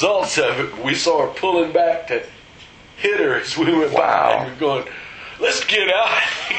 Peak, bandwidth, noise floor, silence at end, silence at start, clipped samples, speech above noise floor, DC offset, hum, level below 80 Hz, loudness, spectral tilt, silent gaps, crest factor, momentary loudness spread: -2 dBFS; 9 kHz; -43 dBFS; 0 s; 0 s; under 0.1%; 25 dB; under 0.1%; none; -56 dBFS; -18 LUFS; -3 dB/octave; none; 18 dB; 9 LU